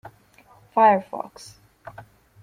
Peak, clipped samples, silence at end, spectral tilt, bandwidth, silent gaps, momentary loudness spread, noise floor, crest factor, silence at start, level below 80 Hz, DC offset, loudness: -6 dBFS; under 0.1%; 0.4 s; -6 dB/octave; 14.5 kHz; none; 26 LU; -54 dBFS; 20 dB; 0.75 s; -66 dBFS; under 0.1%; -20 LUFS